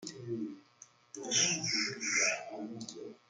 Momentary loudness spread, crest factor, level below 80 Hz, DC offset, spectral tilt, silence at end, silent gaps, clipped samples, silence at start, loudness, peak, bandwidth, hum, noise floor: 17 LU; 20 dB; -82 dBFS; under 0.1%; -1 dB/octave; 0.15 s; none; under 0.1%; 0 s; -32 LUFS; -18 dBFS; 11 kHz; none; -61 dBFS